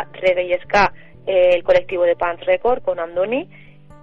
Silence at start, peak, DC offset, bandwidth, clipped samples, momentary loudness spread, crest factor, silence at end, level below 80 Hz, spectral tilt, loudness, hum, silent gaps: 0 s; -4 dBFS; 1%; 6.8 kHz; under 0.1%; 7 LU; 14 dB; 0 s; -46 dBFS; -5 dB/octave; -18 LUFS; none; none